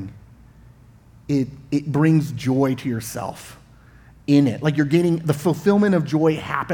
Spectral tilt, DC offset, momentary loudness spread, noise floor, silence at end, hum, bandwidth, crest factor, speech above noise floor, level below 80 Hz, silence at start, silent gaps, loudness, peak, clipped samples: -7 dB/octave; under 0.1%; 12 LU; -48 dBFS; 0 s; none; 18.5 kHz; 18 dB; 29 dB; -52 dBFS; 0 s; none; -20 LUFS; -4 dBFS; under 0.1%